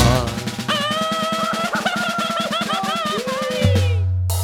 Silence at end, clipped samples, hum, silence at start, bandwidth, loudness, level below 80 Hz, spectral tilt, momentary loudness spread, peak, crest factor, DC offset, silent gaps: 0 s; under 0.1%; none; 0 s; 18 kHz; -20 LUFS; -36 dBFS; -4.5 dB/octave; 4 LU; -2 dBFS; 18 dB; under 0.1%; none